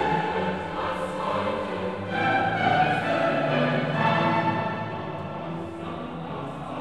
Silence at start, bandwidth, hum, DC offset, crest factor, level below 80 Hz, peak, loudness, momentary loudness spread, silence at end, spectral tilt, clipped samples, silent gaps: 0 s; 12 kHz; none; 0.3%; 16 dB; -54 dBFS; -10 dBFS; -26 LUFS; 11 LU; 0 s; -6.5 dB/octave; under 0.1%; none